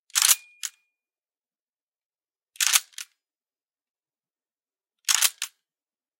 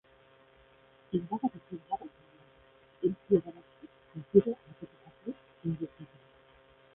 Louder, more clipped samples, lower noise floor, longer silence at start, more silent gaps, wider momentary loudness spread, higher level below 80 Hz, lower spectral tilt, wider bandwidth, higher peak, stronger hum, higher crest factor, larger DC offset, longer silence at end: first, -21 LUFS vs -33 LUFS; neither; first, under -90 dBFS vs -62 dBFS; second, 0.15 s vs 1.1 s; first, 1.69-1.73 s, 1.82-1.87 s, 2.06-2.10 s, 3.90-3.94 s vs none; second, 20 LU vs 24 LU; second, under -90 dBFS vs -68 dBFS; second, 9 dB/octave vs -9 dB/octave; first, 17 kHz vs 3.8 kHz; first, 0 dBFS vs -8 dBFS; neither; about the same, 30 dB vs 26 dB; neither; second, 0.7 s vs 0.9 s